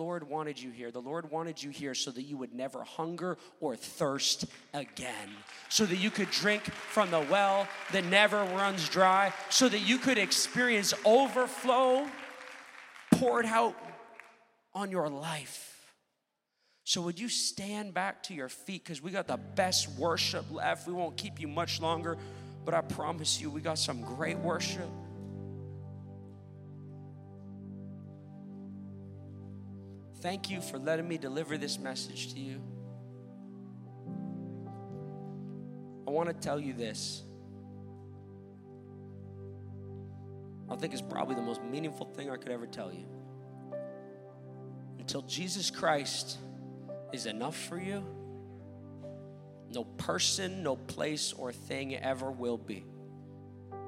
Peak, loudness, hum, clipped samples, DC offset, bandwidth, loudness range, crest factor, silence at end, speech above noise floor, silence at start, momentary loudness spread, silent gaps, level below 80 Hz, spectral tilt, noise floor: -8 dBFS; -33 LUFS; none; under 0.1%; under 0.1%; 16 kHz; 17 LU; 28 dB; 0 s; 50 dB; 0 s; 22 LU; none; -74 dBFS; -3 dB/octave; -83 dBFS